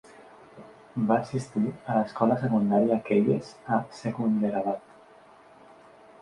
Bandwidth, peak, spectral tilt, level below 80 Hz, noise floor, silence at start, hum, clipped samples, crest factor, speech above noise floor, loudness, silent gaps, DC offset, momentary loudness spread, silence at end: 10.5 kHz; -8 dBFS; -8 dB/octave; -66 dBFS; -53 dBFS; 0.2 s; none; under 0.1%; 18 dB; 28 dB; -27 LUFS; none; under 0.1%; 7 LU; 1.45 s